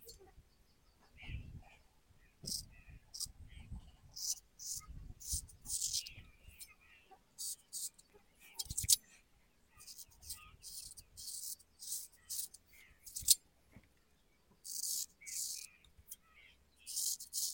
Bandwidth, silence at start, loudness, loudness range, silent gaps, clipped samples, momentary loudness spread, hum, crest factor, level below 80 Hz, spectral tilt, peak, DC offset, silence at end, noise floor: 17 kHz; 0 s; -39 LUFS; 9 LU; none; under 0.1%; 24 LU; none; 36 dB; -60 dBFS; 0.5 dB/octave; -8 dBFS; under 0.1%; 0 s; -73 dBFS